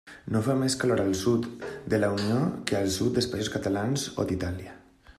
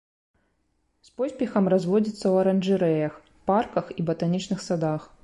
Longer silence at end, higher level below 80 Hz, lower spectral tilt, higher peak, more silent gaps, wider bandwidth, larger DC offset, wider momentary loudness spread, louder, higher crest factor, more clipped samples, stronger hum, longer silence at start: about the same, 0.1 s vs 0.2 s; first, -56 dBFS vs -62 dBFS; second, -5 dB/octave vs -7.5 dB/octave; about the same, -8 dBFS vs -10 dBFS; neither; first, 14.5 kHz vs 11.5 kHz; neither; about the same, 8 LU vs 7 LU; about the same, -27 LUFS vs -25 LUFS; about the same, 20 dB vs 16 dB; neither; neither; second, 0.05 s vs 1.2 s